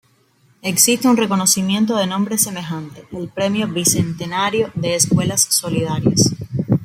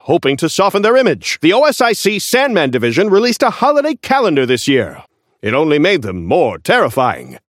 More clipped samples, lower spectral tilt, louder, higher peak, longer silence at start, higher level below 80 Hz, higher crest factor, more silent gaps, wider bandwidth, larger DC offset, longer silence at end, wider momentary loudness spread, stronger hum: neither; about the same, -3.5 dB/octave vs -4.5 dB/octave; second, -17 LUFS vs -13 LUFS; about the same, 0 dBFS vs 0 dBFS; first, 0.65 s vs 0.05 s; about the same, -52 dBFS vs -52 dBFS; about the same, 18 dB vs 14 dB; neither; about the same, 16.5 kHz vs 16.5 kHz; neither; second, 0 s vs 0.15 s; first, 12 LU vs 5 LU; neither